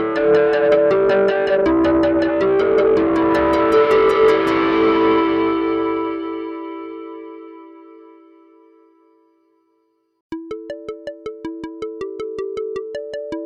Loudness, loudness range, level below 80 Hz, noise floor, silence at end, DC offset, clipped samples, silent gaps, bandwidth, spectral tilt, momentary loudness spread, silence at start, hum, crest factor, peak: -17 LUFS; 21 LU; -46 dBFS; -65 dBFS; 0 s; under 0.1%; under 0.1%; 10.21-10.30 s; 8 kHz; -6.5 dB/octave; 17 LU; 0 s; none; 14 dB; -4 dBFS